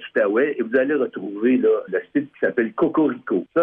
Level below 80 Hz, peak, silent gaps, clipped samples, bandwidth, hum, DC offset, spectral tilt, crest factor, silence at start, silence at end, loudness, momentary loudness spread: -66 dBFS; -6 dBFS; none; under 0.1%; 3.8 kHz; none; under 0.1%; -9 dB/octave; 14 dB; 0 s; 0 s; -21 LUFS; 5 LU